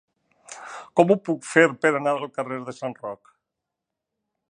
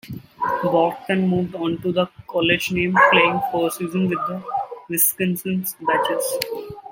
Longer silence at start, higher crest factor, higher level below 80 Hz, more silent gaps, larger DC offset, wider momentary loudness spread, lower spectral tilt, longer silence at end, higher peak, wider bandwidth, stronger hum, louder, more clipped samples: first, 0.5 s vs 0.05 s; about the same, 24 dB vs 20 dB; second, -78 dBFS vs -56 dBFS; neither; neither; first, 20 LU vs 11 LU; first, -5.5 dB/octave vs -4 dB/octave; first, 1.35 s vs 0 s; about the same, -2 dBFS vs 0 dBFS; second, 10.5 kHz vs 16.5 kHz; neither; about the same, -22 LUFS vs -20 LUFS; neither